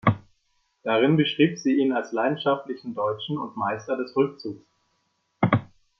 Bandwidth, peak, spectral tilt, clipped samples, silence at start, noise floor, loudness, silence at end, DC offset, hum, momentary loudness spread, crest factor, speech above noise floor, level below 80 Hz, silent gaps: 6.2 kHz; -2 dBFS; -7 dB/octave; under 0.1%; 0.05 s; -72 dBFS; -25 LUFS; 0.35 s; under 0.1%; none; 13 LU; 22 dB; 48 dB; -64 dBFS; none